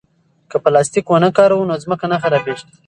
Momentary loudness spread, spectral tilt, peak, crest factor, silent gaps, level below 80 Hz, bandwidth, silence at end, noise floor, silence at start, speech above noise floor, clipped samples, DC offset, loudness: 8 LU; -5.5 dB/octave; 0 dBFS; 16 dB; none; -58 dBFS; 11.5 kHz; 0.25 s; -47 dBFS; 0.5 s; 33 dB; under 0.1%; under 0.1%; -15 LUFS